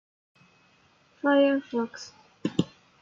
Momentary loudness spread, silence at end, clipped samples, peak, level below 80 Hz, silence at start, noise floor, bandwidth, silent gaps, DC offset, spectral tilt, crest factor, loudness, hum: 17 LU; 0.35 s; under 0.1%; -8 dBFS; -70 dBFS; 1.25 s; -62 dBFS; 7.6 kHz; none; under 0.1%; -6 dB/octave; 20 dB; -27 LUFS; none